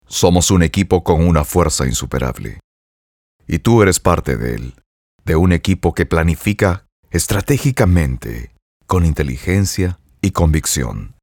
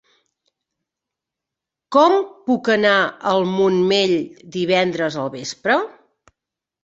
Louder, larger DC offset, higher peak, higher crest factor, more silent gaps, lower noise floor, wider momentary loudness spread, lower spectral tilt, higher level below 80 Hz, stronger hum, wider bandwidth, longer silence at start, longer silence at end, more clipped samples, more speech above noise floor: about the same, -16 LUFS vs -18 LUFS; neither; about the same, 0 dBFS vs -2 dBFS; about the same, 16 dB vs 18 dB; first, 2.64-3.39 s, 4.86-5.19 s, 6.92-7.03 s, 8.62-8.80 s vs none; first, under -90 dBFS vs -85 dBFS; about the same, 11 LU vs 10 LU; about the same, -5.5 dB/octave vs -5 dB/octave; first, -26 dBFS vs -64 dBFS; neither; first, 18 kHz vs 7.8 kHz; second, 0.1 s vs 1.9 s; second, 0.15 s vs 0.95 s; neither; first, over 75 dB vs 67 dB